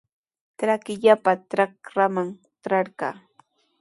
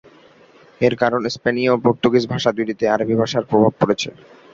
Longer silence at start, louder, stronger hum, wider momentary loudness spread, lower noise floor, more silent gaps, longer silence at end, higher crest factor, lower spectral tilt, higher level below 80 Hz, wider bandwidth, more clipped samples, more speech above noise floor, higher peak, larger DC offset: second, 0.6 s vs 0.8 s; second, -23 LUFS vs -18 LUFS; neither; first, 13 LU vs 5 LU; first, -61 dBFS vs -49 dBFS; neither; first, 0.7 s vs 0.4 s; about the same, 20 dB vs 18 dB; about the same, -6 dB/octave vs -6 dB/octave; second, -74 dBFS vs -54 dBFS; first, 11.5 kHz vs 7.8 kHz; neither; first, 39 dB vs 31 dB; second, -4 dBFS vs 0 dBFS; neither